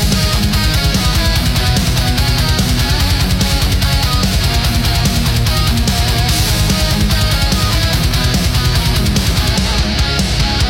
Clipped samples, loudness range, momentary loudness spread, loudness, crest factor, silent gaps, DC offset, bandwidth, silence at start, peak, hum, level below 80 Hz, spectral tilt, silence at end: under 0.1%; 0 LU; 1 LU; -13 LUFS; 12 dB; none; under 0.1%; 16.5 kHz; 0 s; 0 dBFS; none; -18 dBFS; -4 dB/octave; 0 s